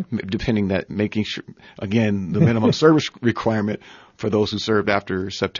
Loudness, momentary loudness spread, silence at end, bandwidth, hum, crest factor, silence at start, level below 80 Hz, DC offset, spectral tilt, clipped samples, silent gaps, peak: -21 LUFS; 11 LU; 0 s; 7.4 kHz; none; 18 dB; 0 s; -48 dBFS; under 0.1%; -6.5 dB/octave; under 0.1%; none; -2 dBFS